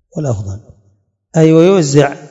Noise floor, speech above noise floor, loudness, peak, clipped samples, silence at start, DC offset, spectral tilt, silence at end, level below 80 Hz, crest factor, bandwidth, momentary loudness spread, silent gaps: -57 dBFS; 46 dB; -11 LUFS; 0 dBFS; 0.5%; 0.15 s; under 0.1%; -6.5 dB/octave; 0 s; -50 dBFS; 12 dB; 8 kHz; 17 LU; none